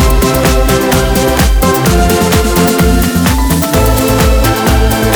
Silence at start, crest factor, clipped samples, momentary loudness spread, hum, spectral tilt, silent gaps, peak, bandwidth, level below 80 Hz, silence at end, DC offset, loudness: 0 s; 8 dB; under 0.1%; 1 LU; none; -5 dB/octave; none; 0 dBFS; over 20 kHz; -14 dBFS; 0 s; under 0.1%; -10 LUFS